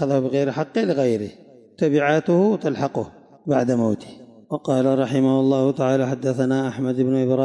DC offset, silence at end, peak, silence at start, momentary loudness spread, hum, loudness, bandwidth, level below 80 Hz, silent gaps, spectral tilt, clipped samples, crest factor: under 0.1%; 0 s; -8 dBFS; 0 s; 10 LU; none; -21 LUFS; 11 kHz; -68 dBFS; none; -7.5 dB/octave; under 0.1%; 12 dB